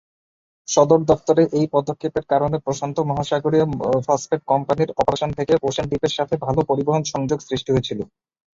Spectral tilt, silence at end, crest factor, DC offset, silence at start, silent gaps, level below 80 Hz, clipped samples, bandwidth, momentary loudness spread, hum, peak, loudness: -6 dB/octave; 0.5 s; 18 dB; under 0.1%; 0.7 s; none; -48 dBFS; under 0.1%; 7.8 kHz; 7 LU; none; -2 dBFS; -20 LUFS